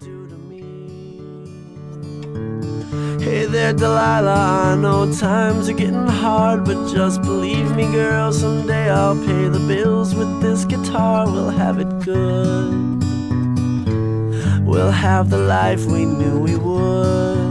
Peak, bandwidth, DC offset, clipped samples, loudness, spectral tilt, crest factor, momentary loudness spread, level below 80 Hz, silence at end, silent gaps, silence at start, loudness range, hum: -4 dBFS; 12 kHz; under 0.1%; under 0.1%; -17 LUFS; -7 dB/octave; 14 dB; 17 LU; -42 dBFS; 0 s; none; 0 s; 3 LU; none